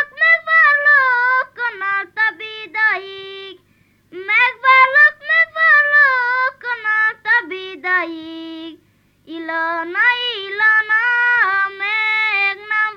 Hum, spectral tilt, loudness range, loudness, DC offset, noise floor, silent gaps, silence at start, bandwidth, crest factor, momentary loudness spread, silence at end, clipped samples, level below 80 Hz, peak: 50 Hz at -65 dBFS; -2.5 dB/octave; 7 LU; -14 LUFS; under 0.1%; -57 dBFS; none; 0 s; 7 kHz; 16 dB; 19 LU; 0 s; under 0.1%; -68 dBFS; -2 dBFS